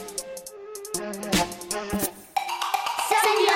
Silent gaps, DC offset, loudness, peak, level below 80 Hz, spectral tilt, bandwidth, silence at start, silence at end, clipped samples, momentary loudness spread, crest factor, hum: none; under 0.1%; -26 LUFS; -8 dBFS; -52 dBFS; -2.5 dB/octave; 17 kHz; 0 s; 0 s; under 0.1%; 16 LU; 18 dB; none